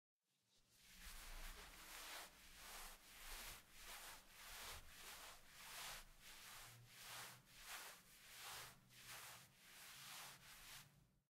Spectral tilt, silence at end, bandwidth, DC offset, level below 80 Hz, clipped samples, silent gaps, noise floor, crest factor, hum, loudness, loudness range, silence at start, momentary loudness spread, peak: -0.5 dB/octave; 0.1 s; 16 kHz; under 0.1%; -68 dBFS; under 0.1%; none; -82 dBFS; 20 dB; none; -57 LUFS; 2 LU; 0.5 s; 7 LU; -40 dBFS